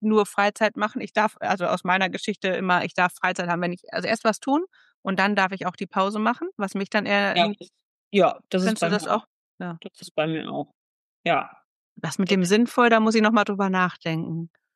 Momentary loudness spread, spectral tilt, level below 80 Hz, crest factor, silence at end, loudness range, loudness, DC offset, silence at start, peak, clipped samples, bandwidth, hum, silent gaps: 13 LU; -5 dB/octave; -80 dBFS; 18 dB; 0.3 s; 5 LU; -23 LUFS; under 0.1%; 0 s; -6 dBFS; under 0.1%; 12.5 kHz; none; 4.94-5.03 s, 7.83-8.11 s, 9.27-9.58 s, 10.11-10.15 s, 10.75-11.24 s, 11.64-11.96 s